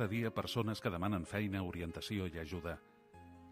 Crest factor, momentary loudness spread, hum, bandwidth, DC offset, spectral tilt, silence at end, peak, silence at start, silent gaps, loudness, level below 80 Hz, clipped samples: 18 dB; 14 LU; none; 15.5 kHz; under 0.1%; -6 dB/octave; 0 s; -22 dBFS; 0 s; none; -40 LUFS; -60 dBFS; under 0.1%